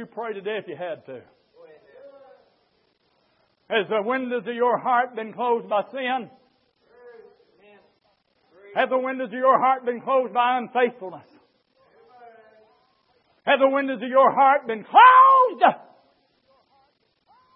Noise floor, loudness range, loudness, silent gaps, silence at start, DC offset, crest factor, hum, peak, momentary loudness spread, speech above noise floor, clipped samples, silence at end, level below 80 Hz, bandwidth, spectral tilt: -67 dBFS; 15 LU; -20 LUFS; none; 0 s; under 0.1%; 20 dB; none; -2 dBFS; 18 LU; 46 dB; under 0.1%; 1.8 s; -84 dBFS; 4.4 kHz; -8.5 dB/octave